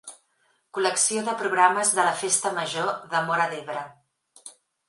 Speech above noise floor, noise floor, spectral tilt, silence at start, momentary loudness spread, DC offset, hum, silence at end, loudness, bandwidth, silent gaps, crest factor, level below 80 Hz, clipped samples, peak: 44 dB; -68 dBFS; -1.5 dB/octave; 0.05 s; 15 LU; under 0.1%; none; 0.4 s; -23 LUFS; 11.5 kHz; none; 22 dB; -80 dBFS; under 0.1%; -4 dBFS